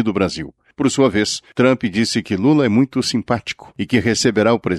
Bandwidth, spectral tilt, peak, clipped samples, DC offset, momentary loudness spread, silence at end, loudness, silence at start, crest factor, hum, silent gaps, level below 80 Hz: 12.5 kHz; -5 dB/octave; -2 dBFS; under 0.1%; under 0.1%; 7 LU; 0 s; -17 LUFS; 0 s; 14 dB; none; none; -48 dBFS